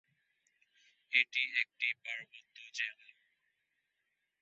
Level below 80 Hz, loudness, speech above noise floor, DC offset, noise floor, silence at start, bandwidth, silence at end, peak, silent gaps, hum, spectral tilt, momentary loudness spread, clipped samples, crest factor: under -90 dBFS; -34 LUFS; 47 dB; under 0.1%; -84 dBFS; 1.1 s; 7.6 kHz; 1.5 s; -14 dBFS; none; none; 5 dB/octave; 15 LU; under 0.1%; 28 dB